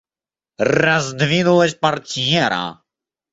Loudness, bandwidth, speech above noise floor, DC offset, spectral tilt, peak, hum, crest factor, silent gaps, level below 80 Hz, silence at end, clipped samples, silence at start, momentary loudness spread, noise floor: -17 LUFS; 8 kHz; over 73 dB; under 0.1%; -4.5 dB/octave; -2 dBFS; none; 18 dB; none; -54 dBFS; 0.6 s; under 0.1%; 0.6 s; 7 LU; under -90 dBFS